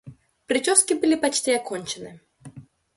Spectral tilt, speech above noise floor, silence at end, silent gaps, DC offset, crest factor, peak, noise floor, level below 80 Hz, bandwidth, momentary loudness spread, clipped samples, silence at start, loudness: -2 dB/octave; 23 dB; 0.35 s; none; under 0.1%; 22 dB; -2 dBFS; -46 dBFS; -64 dBFS; 12 kHz; 16 LU; under 0.1%; 0.05 s; -21 LUFS